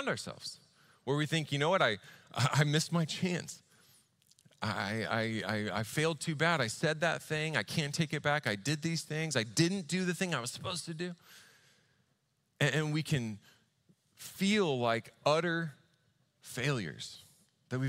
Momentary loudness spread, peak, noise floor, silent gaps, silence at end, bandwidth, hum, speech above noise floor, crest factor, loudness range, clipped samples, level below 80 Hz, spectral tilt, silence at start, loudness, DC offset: 13 LU; -12 dBFS; -77 dBFS; none; 0 s; 16 kHz; none; 44 dB; 22 dB; 4 LU; under 0.1%; -72 dBFS; -4.5 dB/octave; 0 s; -33 LUFS; under 0.1%